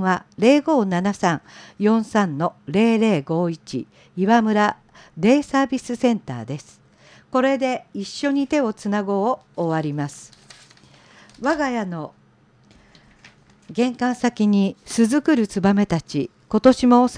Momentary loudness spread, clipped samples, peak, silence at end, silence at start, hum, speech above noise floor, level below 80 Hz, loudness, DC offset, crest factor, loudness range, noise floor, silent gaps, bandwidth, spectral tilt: 13 LU; under 0.1%; -2 dBFS; 0 s; 0 s; none; 36 dB; -56 dBFS; -20 LUFS; under 0.1%; 18 dB; 7 LU; -55 dBFS; none; 10.5 kHz; -6 dB/octave